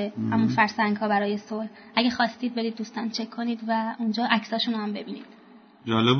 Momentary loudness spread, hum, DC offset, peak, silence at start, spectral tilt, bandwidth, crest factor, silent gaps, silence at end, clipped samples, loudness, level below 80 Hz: 11 LU; none; under 0.1%; -6 dBFS; 0 s; -6 dB/octave; 6.6 kHz; 20 dB; none; 0 s; under 0.1%; -26 LUFS; -68 dBFS